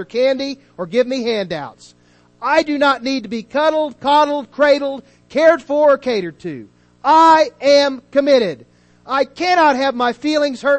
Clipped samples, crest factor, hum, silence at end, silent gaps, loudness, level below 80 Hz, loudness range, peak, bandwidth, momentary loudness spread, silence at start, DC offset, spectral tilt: under 0.1%; 16 dB; 60 Hz at -50 dBFS; 0 s; none; -16 LUFS; -58 dBFS; 5 LU; 0 dBFS; 8.6 kHz; 13 LU; 0 s; under 0.1%; -4 dB/octave